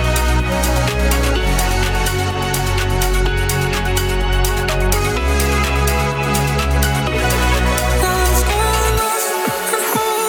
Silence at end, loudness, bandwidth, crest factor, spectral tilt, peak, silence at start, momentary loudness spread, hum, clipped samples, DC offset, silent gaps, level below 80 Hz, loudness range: 0 s; -17 LUFS; 19 kHz; 14 dB; -4 dB/octave; -2 dBFS; 0 s; 2 LU; none; under 0.1%; under 0.1%; none; -20 dBFS; 2 LU